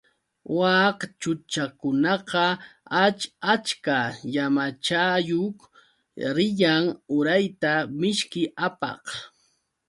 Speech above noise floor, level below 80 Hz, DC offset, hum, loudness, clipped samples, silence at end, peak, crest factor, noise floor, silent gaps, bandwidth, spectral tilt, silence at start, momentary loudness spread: 45 dB; -68 dBFS; under 0.1%; none; -24 LUFS; under 0.1%; 0.6 s; -6 dBFS; 20 dB; -69 dBFS; none; 11.5 kHz; -4.5 dB/octave; 0.5 s; 10 LU